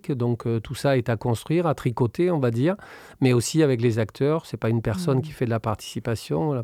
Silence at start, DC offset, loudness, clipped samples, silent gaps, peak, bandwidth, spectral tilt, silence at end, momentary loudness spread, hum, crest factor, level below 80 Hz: 0.05 s; under 0.1%; -24 LUFS; under 0.1%; none; -8 dBFS; 15 kHz; -6.5 dB/octave; 0 s; 7 LU; none; 16 dB; -52 dBFS